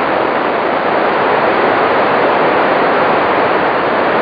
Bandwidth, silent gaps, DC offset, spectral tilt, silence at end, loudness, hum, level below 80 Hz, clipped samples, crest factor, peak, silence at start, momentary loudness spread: 5.2 kHz; none; under 0.1%; -7 dB/octave; 0 s; -12 LUFS; none; -50 dBFS; under 0.1%; 12 dB; 0 dBFS; 0 s; 2 LU